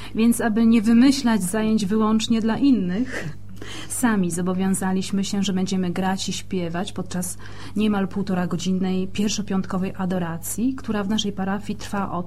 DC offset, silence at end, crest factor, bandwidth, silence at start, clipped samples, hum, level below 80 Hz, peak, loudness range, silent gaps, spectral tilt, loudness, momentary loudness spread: 2%; 0 s; 16 dB; 15.5 kHz; 0 s; under 0.1%; none; -46 dBFS; -6 dBFS; 5 LU; none; -5 dB/octave; -22 LUFS; 11 LU